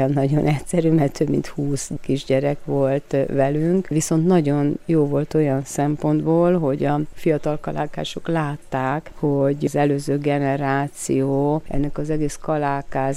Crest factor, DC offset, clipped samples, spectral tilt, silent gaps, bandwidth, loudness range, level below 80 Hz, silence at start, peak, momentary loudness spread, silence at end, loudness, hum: 14 dB; under 0.1%; under 0.1%; -7 dB/octave; none; 14.5 kHz; 3 LU; -42 dBFS; 0 s; -6 dBFS; 7 LU; 0 s; -21 LUFS; none